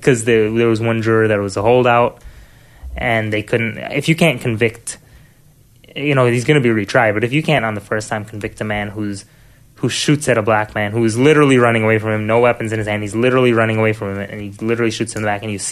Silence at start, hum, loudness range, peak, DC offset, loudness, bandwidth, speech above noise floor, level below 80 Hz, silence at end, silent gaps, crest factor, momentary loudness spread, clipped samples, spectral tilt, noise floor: 0 s; none; 5 LU; 0 dBFS; under 0.1%; -16 LUFS; 13.5 kHz; 33 dB; -44 dBFS; 0 s; none; 16 dB; 12 LU; under 0.1%; -5.5 dB/octave; -48 dBFS